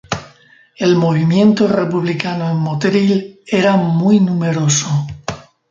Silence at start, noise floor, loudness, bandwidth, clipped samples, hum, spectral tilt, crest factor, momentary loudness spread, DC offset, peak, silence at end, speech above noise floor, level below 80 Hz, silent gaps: 0.1 s; -47 dBFS; -15 LUFS; 7.8 kHz; under 0.1%; none; -5.5 dB/octave; 14 dB; 13 LU; under 0.1%; 0 dBFS; 0.3 s; 33 dB; -50 dBFS; none